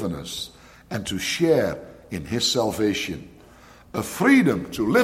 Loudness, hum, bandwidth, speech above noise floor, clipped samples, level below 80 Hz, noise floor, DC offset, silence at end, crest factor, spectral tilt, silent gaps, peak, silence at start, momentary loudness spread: -23 LUFS; none; 16.5 kHz; 27 dB; under 0.1%; -50 dBFS; -49 dBFS; under 0.1%; 0 s; 18 dB; -4.5 dB/octave; none; -6 dBFS; 0 s; 16 LU